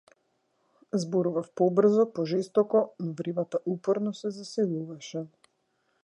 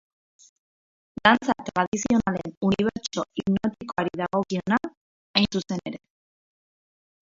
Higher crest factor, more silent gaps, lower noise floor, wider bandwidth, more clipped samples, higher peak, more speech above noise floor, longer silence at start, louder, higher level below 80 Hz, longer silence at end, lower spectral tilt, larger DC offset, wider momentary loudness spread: second, 18 dB vs 26 dB; second, none vs 1.87-1.92 s, 2.57-2.61 s, 4.97-5.34 s; second, -74 dBFS vs under -90 dBFS; first, 10.5 kHz vs 7.8 kHz; neither; second, -10 dBFS vs 0 dBFS; second, 47 dB vs over 65 dB; second, 0.95 s vs 1.25 s; second, -28 LUFS vs -25 LUFS; second, -80 dBFS vs -56 dBFS; second, 0.75 s vs 1.4 s; first, -7 dB/octave vs -5 dB/octave; neither; about the same, 13 LU vs 11 LU